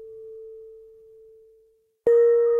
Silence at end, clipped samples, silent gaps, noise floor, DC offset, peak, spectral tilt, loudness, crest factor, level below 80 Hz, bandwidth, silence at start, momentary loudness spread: 0 s; under 0.1%; none; -62 dBFS; under 0.1%; -10 dBFS; -7 dB/octave; -20 LUFS; 14 dB; -68 dBFS; 2.1 kHz; 0 s; 25 LU